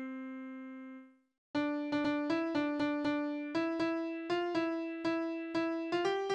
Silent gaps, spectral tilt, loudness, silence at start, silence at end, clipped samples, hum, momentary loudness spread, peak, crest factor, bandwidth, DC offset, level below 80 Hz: 1.38-1.54 s; -5.5 dB/octave; -35 LUFS; 0 s; 0 s; under 0.1%; none; 12 LU; -22 dBFS; 14 dB; 8.4 kHz; under 0.1%; -74 dBFS